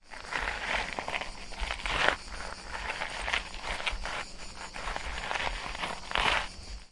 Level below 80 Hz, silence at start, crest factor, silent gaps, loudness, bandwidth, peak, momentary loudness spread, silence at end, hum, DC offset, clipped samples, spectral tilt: -44 dBFS; 0.05 s; 30 dB; none; -33 LUFS; 11.5 kHz; -4 dBFS; 13 LU; 0.05 s; none; under 0.1%; under 0.1%; -2 dB/octave